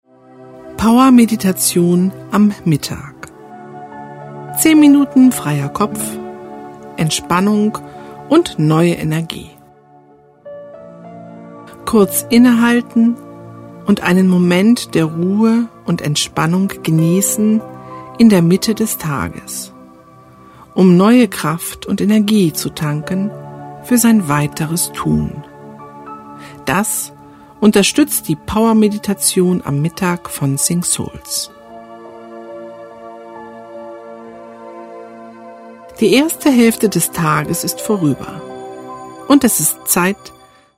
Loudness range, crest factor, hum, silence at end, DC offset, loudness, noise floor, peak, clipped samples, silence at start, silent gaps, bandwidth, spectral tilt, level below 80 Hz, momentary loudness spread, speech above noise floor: 7 LU; 16 dB; none; 0.5 s; under 0.1%; -14 LUFS; -46 dBFS; 0 dBFS; under 0.1%; 0.4 s; none; 16 kHz; -5 dB/octave; -46 dBFS; 23 LU; 33 dB